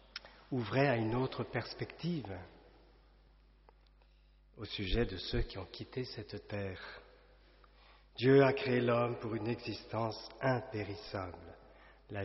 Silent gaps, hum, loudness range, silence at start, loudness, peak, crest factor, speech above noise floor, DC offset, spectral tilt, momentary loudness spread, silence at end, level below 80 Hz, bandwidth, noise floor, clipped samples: none; none; 11 LU; 0.15 s; -36 LUFS; -16 dBFS; 22 dB; 29 dB; under 0.1%; -5 dB/octave; 19 LU; 0 s; -52 dBFS; 5.8 kHz; -64 dBFS; under 0.1%